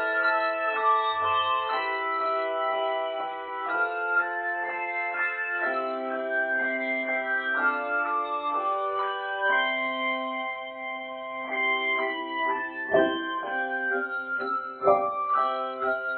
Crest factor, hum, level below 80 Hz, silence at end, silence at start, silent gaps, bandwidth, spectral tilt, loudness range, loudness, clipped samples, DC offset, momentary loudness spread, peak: 20 dB; none; -74 dBFS; 0 s; 0 s; none; 4.6 kHz; -6.5 dB/octave; 2 LU; -27 LUFS; under 0.1%; under 0.1%; 6 LU; -8 dBFS